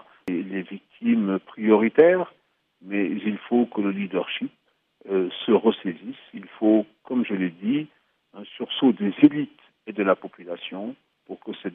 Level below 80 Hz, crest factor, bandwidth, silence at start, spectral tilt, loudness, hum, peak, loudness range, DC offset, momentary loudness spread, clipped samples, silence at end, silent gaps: -76 dBFS; 22 dB; 3.9 kHz; 0.25 s; -9 dB/octave; -23 LUFS; none; -2 dBFS; 3 LU; under 0.1%; 19 LU; under 0.1%; 0.05 s; none